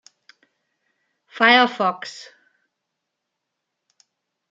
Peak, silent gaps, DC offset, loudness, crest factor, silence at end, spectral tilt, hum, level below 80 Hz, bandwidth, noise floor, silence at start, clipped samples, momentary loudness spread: -2 dBFS; none; under 0.1%; -17 LUFS; 24 dB; 2.3 s; -3.5 dB/octave; none; -78 dBFS; 7.8 kHz; -80 dBFS; 1.35 s; under 0.1%; 21 LU